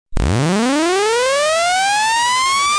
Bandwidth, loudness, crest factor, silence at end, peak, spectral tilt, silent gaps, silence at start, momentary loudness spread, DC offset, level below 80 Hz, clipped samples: 10.5 kHz; -15 LUFS; 8 dB; 0 s; -8 dBFS; -3.5 dB/octave; none; 0.1 s; 2 LU; under 0.1%; -30 dBFS; under 0.1%